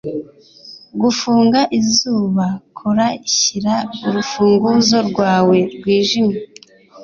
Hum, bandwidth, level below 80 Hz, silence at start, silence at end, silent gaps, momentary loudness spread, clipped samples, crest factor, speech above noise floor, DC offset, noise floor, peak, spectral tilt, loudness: none; 7.4 kHz; -54 dBFS; 0.05 s; 0 s; none; 8 LU; under 0.1%; 14 dB; 28 dB; under 0.1%; -43 dBFS; -2 dBFS; -4 dB/octave; -15 LUFS